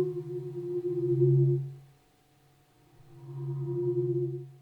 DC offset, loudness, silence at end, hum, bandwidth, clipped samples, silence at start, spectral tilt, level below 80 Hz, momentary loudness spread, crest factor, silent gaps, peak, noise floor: under 0.1%; -30 LUFS; 0.05 s; none; 2.1 kHz; under 0.1%; 0 s; -12 dB/octave; -72 dBFS; 17 LU; 16 dB; none; -14 dBFS; -64 dBFS